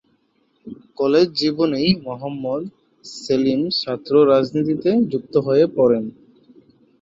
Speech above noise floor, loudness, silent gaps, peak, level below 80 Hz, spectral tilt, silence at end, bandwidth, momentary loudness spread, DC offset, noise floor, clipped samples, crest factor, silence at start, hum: 45 dB; -19 LUFS; none; -2 dBFS; -58 dBFS; -6.5 dB/octave; 0.9 s; 7.8 kHz; 18 LU; under 0.1%; -64 dBFS; under 0.1%; 16 dB; 0.65 s; none